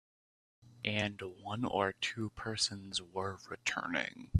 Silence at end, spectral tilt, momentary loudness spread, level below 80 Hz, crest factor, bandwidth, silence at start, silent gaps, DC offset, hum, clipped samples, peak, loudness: 0 s; -4 dB/octave; 7 LU; -66 dBFS; 24 dB; 13.5 kHz; 0.65 s; none; under 0.1%; none; under 0.1%; -14 dBFS; -37 LUFS